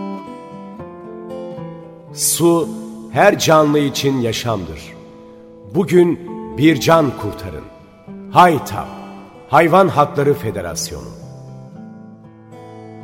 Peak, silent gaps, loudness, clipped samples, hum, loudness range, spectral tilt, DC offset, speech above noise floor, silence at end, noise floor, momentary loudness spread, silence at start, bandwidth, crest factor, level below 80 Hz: 0 dBFS; none; -15 LUFS; under 0.1%; none; 3 LU; -5 dB/octave; under 0.1%; 25 dB; 0 s; -40 dBFS; 24 LU; 0 s; 16.5 kHz; 18 dB; -48 dBFS